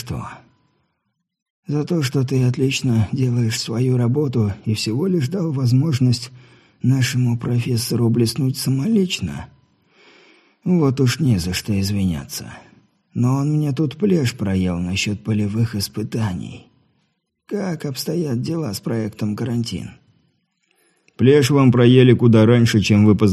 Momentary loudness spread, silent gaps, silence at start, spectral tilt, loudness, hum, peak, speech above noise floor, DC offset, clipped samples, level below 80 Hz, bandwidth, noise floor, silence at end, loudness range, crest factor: 13 LU; 1.42-1.63 s; 0 s; -6.5 dB/octave; -19 LUFS; none; 0 dBFS; 56 dB; under 0.1%; under 0.1%; -48 dBFS; 13.5 kHz; -74 dBFS; 0 s; 8 LU; 18 dB